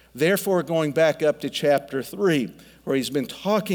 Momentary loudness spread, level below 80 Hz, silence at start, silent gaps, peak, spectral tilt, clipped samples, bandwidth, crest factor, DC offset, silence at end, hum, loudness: 7 LU; -62 dBFS; 0.15 s; none; -8 dBFS; -5 dB/octave; under 0.1%; over 20 kHz; 14 dB; under 0.1%; 0 s; none; -23 LUFS